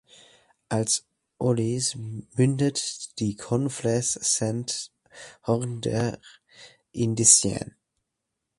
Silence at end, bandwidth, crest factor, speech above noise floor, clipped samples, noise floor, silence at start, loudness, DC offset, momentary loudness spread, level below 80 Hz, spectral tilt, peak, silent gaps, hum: 0.9 s; 11.5 kHz; 24 dB; 57 dB; under 0.1%; -82 dBFS; 0.7 s; -24 LUFS; under 0.1%; 17 LU; -58 dBFS; -4 dB/octave; -2 dBFS; none; none